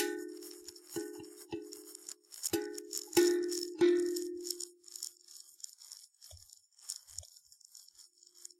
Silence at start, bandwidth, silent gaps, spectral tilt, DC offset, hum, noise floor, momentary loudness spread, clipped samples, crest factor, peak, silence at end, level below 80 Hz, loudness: 0 s; 16.5 kHz; none; -2.5 dB/octave; under 0.1%; none; -61 dBFS; 25 LU; under 0.1%; 24 dB; -14 dBFS; 0.55 s; -76 dBFS; -36 LUFS